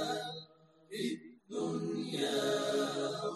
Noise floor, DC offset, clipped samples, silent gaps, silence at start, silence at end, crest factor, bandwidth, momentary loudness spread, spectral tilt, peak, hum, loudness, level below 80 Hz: -61 dBFS; under 0.1%; under 0.1%; none; 0 s; 0 s; 16 dB; 13 kHz; 12 LU; -4 dB/octave; -22 dBFS; none; -36 LUFS; -82 dBFS